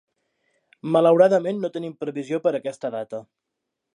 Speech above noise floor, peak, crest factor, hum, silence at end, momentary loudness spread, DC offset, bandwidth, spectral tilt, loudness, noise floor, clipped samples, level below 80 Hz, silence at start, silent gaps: 60 dB; -4 dBFS; 20 dB; none; 0.75 s; 17 LU; under 0.1%; 10.5 kHz; -7 dB/octave; -22 LUFS; -82 dBFS; under 0.1%; -78 dBFS; 0.85 s; none